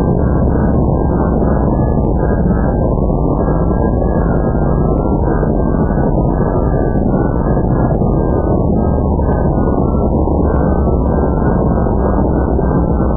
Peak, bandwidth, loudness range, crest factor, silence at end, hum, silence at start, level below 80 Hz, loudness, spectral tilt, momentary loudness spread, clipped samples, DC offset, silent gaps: -2 dBFS; 1.8 kHz; 0 LU; 10 dB; 0 s; none; 0 s; -18 dBFS; -14 LUFS; -15.5 dB/octave; 1 LU; under 0.1%; under 0.1%; none